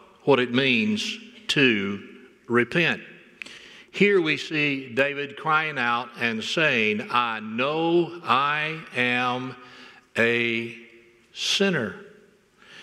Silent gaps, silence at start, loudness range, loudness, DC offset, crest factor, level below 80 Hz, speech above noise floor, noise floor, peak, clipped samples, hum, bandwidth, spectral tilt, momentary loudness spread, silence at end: none; 0.25 s; 3 LU; -23 LUFS; under 0.1%; 20 dB; -72 dBFS; 32 dB; -56 dBFS; -4 dBFS; under 0.1%; none; 14 kHz; -4.5 dB/octave; 16 LU; 0 s